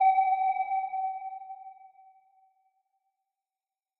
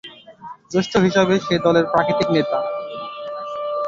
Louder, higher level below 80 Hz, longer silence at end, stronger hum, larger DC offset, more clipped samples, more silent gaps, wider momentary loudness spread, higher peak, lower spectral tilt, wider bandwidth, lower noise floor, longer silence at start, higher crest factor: second, -29 LUFS vs -19 LUFS; second, under -90 dBFS vs -54 dBFS; first, 2.1 s vs 0 s; neither; neither; neither; neither; about the same, 21 LU vs 19 LU; second, -16 dBFS vs -2 dBFS; second, 2.5 dB/octave vs -6 dB/octave; second, 4.1 kHz vs 7.6 kHz; first, under -90 dBFS vs -39 dBFS; about the same, 0 s vs 0.05 s; about the same, 16 dB vs 18 dB